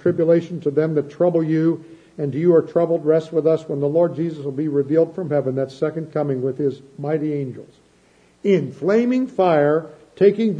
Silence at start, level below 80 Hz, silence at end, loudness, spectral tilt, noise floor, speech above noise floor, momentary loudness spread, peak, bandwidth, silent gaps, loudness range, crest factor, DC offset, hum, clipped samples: 0.05 s; -66 dBFS; 0 s; -20 LUFS; -9 dB/octave; -55 dBFS; 36 dB; 9 LU; -4 dBFS; 8.2 kHz; none; 5 LU; 16 dB; under 0.1%; none; under 0.1%